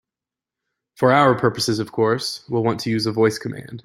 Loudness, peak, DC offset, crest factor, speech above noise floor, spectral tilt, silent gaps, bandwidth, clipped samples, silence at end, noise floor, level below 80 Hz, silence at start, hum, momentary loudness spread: -20 LUFS; -2 dBFS; under 0.1%; 20 dB; 69 dB; -5.5 dB/octave; none; 16 kHz; under 0.1%; 0.05 s; -88 dBFS; -58 dBFS; 1 s; none; 9 LU